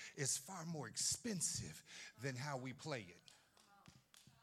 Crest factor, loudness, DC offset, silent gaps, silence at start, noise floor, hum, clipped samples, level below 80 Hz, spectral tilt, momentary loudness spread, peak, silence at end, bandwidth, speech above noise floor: 20 dB; -44 LUFS; under 0.1%; none; 0 s; -70 dBFS; none; under 0.1%; -78 dBFS; -2.5 dB/octave; 14 LU; -28 dBFS; 0.15 s; 16.5 kHz; 25 dB